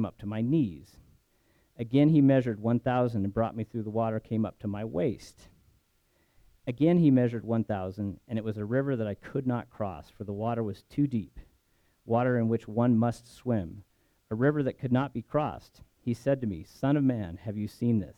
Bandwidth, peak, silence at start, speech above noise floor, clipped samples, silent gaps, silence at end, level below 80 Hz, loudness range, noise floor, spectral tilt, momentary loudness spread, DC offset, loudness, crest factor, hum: 11.5 kHz; -12 dBFS; 0 s; 41 dB; under 0.1%; none; 0.05 s; -58 dBFS; 5 LU; -70 dBFS; -9 dB/octave; 13 LU; under 0.1%; -29 LUFS; 18 dB; none